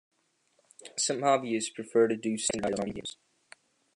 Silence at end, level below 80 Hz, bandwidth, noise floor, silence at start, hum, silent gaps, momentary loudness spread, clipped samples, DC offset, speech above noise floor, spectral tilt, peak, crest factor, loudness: 0.85 s; -66 dBFS; 11.5 kHz; -72 dBFS; 0.8 s; none; none; 14 LU; under 0.1%; under 0.1%; 43 dB; -3.5 dB/octave; -12 dBFS; 20 dB; -29 LUFS